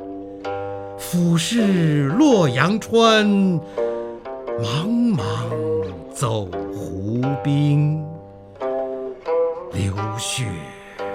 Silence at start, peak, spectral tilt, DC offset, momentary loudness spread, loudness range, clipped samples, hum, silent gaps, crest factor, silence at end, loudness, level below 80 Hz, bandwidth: 0 s; 0 dBFS; -6 dB/octave; under 0.1%; 15 LU; 6 LU; under 0.1%; none; none; 20 dB; 0 s; -20 LUFS; -52 dBFS; 16 kHz